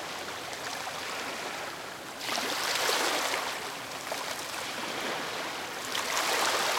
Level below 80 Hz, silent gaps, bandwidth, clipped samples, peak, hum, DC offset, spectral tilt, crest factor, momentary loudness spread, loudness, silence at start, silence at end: -70 dBFS; none; 17 kHz; under 0.1%; -12 dBFS; none; under 0.1%; -0.5 dB/octave; 20 dB; 10 LU; -31 LUFS; 0 s; 0 s